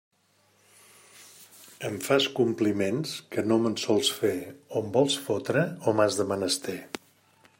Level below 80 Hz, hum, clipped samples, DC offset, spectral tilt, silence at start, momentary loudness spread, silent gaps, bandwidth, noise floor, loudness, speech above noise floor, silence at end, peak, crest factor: -72 dBFS; none; under 0.1%; under 0.1%; -4.5 dB/octave; 1.15 s; 11 LU; none; 16.5 kHz; -66 dBFS; -27 LUFS; 39 dB; 0.65 s; -8 dBFS; 20 dB